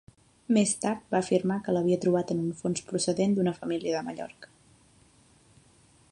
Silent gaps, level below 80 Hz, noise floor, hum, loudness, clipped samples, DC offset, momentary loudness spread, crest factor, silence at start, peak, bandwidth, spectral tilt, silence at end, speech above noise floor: none; -66 dBFS; -60 dBFS; none; -28 LUFS; under 0.1%; under 0.1%; 7 LU; 18 dB; 0.5 s; -10 dBFS; 11.5 kHz; -5.5 dB/octave; 1.65 s; 33 dB